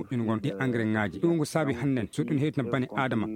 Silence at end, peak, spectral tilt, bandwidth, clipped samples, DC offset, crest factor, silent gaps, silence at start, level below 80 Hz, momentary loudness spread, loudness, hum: 0 s; -10 dBFS; -7 dB/octave; 16 kHz; under 0.1%; under 0.1%; 18 dB; none; 0 s; -62 dBFS; 3 LU; -28 LUFS; none